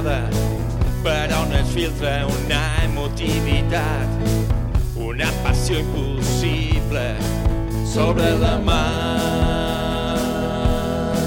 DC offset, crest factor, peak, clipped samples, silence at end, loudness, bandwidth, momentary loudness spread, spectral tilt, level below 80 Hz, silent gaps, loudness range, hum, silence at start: under 0.1%; 16 dB; -4 dBFS; under 0.1%; 0 s; -21 LUFS; 17 kHz; 4 LU; -5.5 dB/octave; -24 dBFS; none; 1 LU; none; 0 s